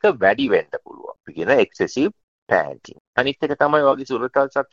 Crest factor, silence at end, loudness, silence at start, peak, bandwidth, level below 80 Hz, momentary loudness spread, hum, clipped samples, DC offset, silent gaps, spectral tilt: 18 dB; 0.1 s; -20 LUFS; 0.05 s; -2 dBFS; 7.4 kHz; -60 dBFS; 16 LU; none; under 0.1%; under 0.1%; 2.23-2.47 s, 3.00-3.13 s; -5.5 dB/octave